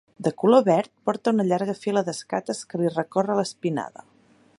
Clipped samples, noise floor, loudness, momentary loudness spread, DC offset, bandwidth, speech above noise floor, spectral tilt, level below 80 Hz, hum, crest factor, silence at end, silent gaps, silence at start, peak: under 0.1%; -58 dBFS; -24 LUFS; 11 LU; under 0.1%; 11.5 kHz; 35 dB; -6 dB/octave; -72 dBFS; none; 20 dB; 0.7 s; none; 0.2 s; -4 dBFS